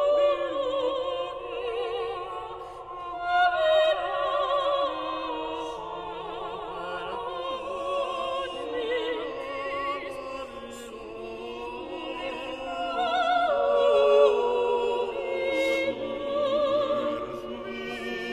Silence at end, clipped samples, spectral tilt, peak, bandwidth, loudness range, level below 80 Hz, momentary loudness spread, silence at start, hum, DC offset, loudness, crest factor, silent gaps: 0 s; under 0.1%; -4 dB/octave; -10 dBFS; 11.5 kHz; 9 LU; -58 dBFS; 14 LU; 0 s; none; under 0.1%; -28 LUFS; 18 dB; none